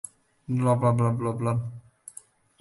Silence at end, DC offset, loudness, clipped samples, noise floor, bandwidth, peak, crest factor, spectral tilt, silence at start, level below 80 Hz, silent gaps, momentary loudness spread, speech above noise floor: 0.8 s; under 0.1%; -25 LUFS; under 0.1%; -51 dBFS; 11.5 kHz; -12 dBFS; 16 dB; -8 dB/octave; 0.5 s; -58 dBFS; none; 22 LU; 27 dB